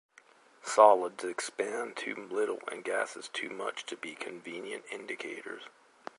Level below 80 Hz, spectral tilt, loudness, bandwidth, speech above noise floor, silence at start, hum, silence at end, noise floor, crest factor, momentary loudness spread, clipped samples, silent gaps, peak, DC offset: -90 dBFS; -2 dB/octave; -32 LUFS; 11.5 kHz; 29 dB; 0.65 s; none; 0.5 s; -61 dBFS; 26 dB; 19 LU; under 0.1%; none; -6 dBFS; under 0.1%